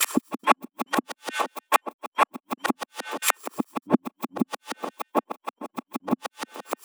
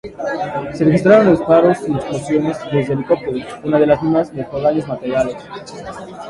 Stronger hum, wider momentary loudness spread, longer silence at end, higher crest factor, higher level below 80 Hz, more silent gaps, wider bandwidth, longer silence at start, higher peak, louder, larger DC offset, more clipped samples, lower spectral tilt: neither; second, 12 LU vs 15 LU; about the same, 0.1 s vs 0 s; first, 26 dB vs 16 dB; second, -78 dBFS vs -48 dBFS; first, 1.93-1.99 s, 2.07-2.12 s vs none; first, over 20 kHz vs 11.5 kHz; about the same, 0 s vs 0.05 s; about the same, -2 dBFS vs 0 dBFS; second, -28 LUFS vs -16 LUFS; neither; neither; second, -3 dB/octave vs -7.5 dB/octave